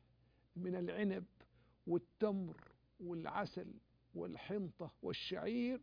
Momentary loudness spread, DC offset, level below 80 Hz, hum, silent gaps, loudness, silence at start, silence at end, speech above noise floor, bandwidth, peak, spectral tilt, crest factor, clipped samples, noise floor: 15 LU; under 0.1%; -74 dBFS; none; none; -43 LUFS; 0.55 s; 0 s; 31 dB; 5.2 kHz; -24 dBFS; -5.5 dB/octave; 20 dB; under 0.1%; -73 dBFS